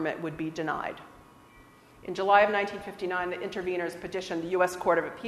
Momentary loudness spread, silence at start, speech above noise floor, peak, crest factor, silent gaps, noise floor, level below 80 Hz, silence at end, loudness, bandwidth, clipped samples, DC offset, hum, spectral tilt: 14 LU; 0 s; 26 dB; -8 dBFS; 22 dB; none; -55 dBFS; -62 dBFS; 0 s; -29 LUFS; 13.5 kHz; under 0.1%; under 0.1%; none; -5 dB/octave